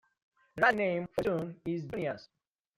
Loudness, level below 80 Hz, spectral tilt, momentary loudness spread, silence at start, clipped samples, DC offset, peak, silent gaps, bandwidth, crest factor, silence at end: -32 LUFS; -66 dBFS; -6.5 dB/octave; 12 LU; 0.55 s; under 0.1%; under 0.1%; -12 dBFS; none; 15.5 kHz; 22 dB; 0.5 s